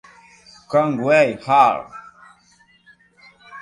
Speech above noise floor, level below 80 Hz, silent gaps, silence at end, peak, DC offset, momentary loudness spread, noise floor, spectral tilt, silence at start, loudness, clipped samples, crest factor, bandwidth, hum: 39 dB; -64 dBFS; none; 0 s; -2 dBFS; under 0.1%; 18 LU; -56 dBFS; -6 dB/octave; 0.7 s; -17 LUFS; under 0.1%; 20 dB; 11 kHz; none